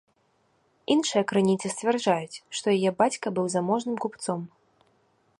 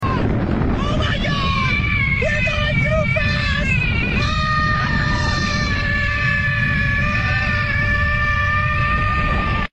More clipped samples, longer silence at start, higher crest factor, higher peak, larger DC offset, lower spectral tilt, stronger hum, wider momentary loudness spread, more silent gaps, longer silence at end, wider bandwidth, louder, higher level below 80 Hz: neither; first, 0.9 s vs 0 s; first, 20 dB vs 12 dB; about the same, -8 dBFS vs -6 dBFS; second, under 0.1% vs 0.2%; second, -4.5 dB/octave vs -6 dB/octave; neither; first, 9 LU vs 2 LU; neither; first, 0.9 s vs 0.05 s; first, 11.5 kHz vs 9 kHz; second, -26 LUFS vs -18 LUFS; second, -70 dBFS vs -26 dBFS